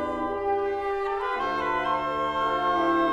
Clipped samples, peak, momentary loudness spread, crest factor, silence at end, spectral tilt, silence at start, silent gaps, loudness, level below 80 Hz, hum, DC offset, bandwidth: under 0.1%; -12 dBFS; 5 LU; 14 dB; 0 s; -5.5 dB/octave; 0 s; none; -26 LUFS; -52 dBFS; none; under 0.1%; 11.5 kHz